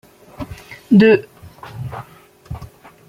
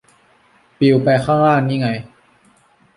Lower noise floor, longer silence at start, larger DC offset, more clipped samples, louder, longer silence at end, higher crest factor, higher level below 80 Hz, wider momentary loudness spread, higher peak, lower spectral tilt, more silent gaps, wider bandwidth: second, -45 dBFS vs -54 dBFS; second, 0.4 s vs 0.8 s; neither; neither; first, -13 LUFS vs -16 LUFS; second, 0.45 s vs 0.9 s; about the same, 16 dB vs 16 dB; first, -46 dBFS vs -54 dBFS; first, 25 LU vs 8 LU; about the same, -2 dBFS vs -2 dBFS; about the same, -8 dB/octave vs -8 dB/octave; neither; first, 15 kHz vs 11 kHz